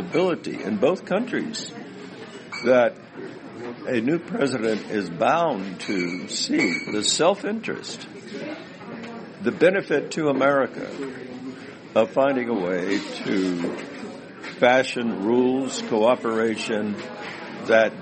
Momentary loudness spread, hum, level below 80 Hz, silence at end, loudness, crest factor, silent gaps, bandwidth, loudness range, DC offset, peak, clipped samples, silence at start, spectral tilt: 17 LU; none; -68 dBFS; 0 s; -23 LUFS; 20 dB; none; 8.8 kHz; 3 LU; under 0.1%; -4 dBFS; under 0.1%; 0 s; -4.5 dB/octave